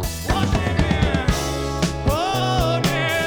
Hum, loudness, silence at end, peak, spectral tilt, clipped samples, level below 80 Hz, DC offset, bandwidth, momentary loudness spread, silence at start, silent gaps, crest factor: none; -21 LUFS; 0 s; -4 dBFS; -5 dB/octave; under 0.1%; -28 dBFS; under 0.1%; over 20 kHz; 3 LU; 0 s; none; 16 dB